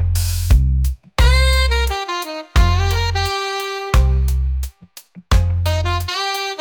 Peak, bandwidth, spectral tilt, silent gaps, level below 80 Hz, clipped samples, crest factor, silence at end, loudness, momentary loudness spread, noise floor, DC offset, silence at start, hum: -2 dBFS; 19.5 kHz; -4.5 dB/octave; none; -18 dBFS; under 0.1%; 14 dB; 0 s; -18 LUFS; 7 LU; -42 dBFS; under 0.1%; 0 s; none